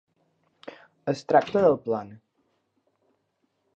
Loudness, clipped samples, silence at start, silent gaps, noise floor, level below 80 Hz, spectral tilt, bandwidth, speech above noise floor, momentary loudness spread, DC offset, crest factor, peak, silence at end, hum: -24 LUFS; under 0.1%; 0.65 s; none; -74 dBFS; -68 dBFS; -7 dB/octave; 8.2 kHz; 51 dB; 24 LU; under 0.1%; 24 dB; -6 dBFS; 1.6 s; none